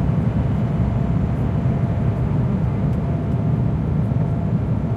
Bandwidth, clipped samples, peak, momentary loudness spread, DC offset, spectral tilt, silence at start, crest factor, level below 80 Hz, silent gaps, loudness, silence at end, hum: 4.9 kHz; under 0.1%; -8 dBFS; 1 LU; under 0.1%; -10.5 dB/octave; 0 s; 10 dB; -30 dBFS; none; -21 LUFS; 0 s; none